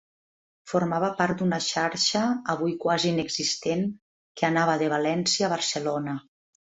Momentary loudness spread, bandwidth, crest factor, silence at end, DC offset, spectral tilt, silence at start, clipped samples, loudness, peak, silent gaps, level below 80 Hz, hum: 6 LU; 8.2 kHz; 18 dB; 0.45 s; under 0.1%; -4 dB/octave; 0.65 s; under 0.1%; -25 LUFS; -8 dBFS; 4.02-4.35 s; -66 dBFS; none